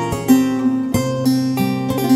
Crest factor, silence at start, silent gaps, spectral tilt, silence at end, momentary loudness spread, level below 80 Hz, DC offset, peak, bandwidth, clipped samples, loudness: 16 dB; 0 s; none; -6 dB/octave; 0 s; 5 LU; -44 dBFS; under 0.1%; 0 dBFS; 16 kHz; under 0.1%; -17 LUFS